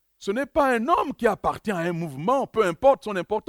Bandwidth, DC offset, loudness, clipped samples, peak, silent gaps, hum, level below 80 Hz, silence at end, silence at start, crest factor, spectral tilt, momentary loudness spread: 16 kHz; under 0.1%; -24 LUFS; under 0.1%; -6 dBFS; none; none; -52 dBFS; 0.05 s; 0.2 s; 18 dB; -6 dB/octave; 7 LU